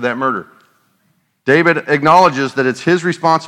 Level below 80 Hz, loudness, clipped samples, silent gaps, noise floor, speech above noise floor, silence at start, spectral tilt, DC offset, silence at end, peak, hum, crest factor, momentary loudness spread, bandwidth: -62 dBFS; -13 LUFS; 0.2%; none; -61 dBFS; 48 dB; 0 s; -5.5 dB/octave; under 0.1%; 0 s; 0 dBFS; none; 14 dB; 9 LU; 13 kHz